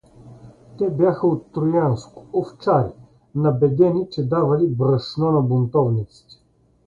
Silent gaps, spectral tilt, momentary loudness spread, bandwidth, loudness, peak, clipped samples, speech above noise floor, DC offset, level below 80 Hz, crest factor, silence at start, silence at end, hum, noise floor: none; -9.5 dB/octave; 8 LU; 7.4 kHz; -20 LUFS; -4 dBFS; under 0.1%; 24 dB; under 0.1%; -52 dBFS; 16 dB; 0.25 s; 0.8 s; none; -44 dBFS